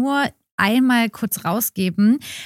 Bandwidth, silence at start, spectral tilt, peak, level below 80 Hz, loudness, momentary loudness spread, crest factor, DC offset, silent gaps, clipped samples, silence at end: 16.5 kHz; 0 s; -4.5 dB/octave; -2 dBFS; -60 dBFS; -19 LUFS; 6 LU; 16 dB; under 0.1%; 0.51-0.58 s; under 0.1%; 0 s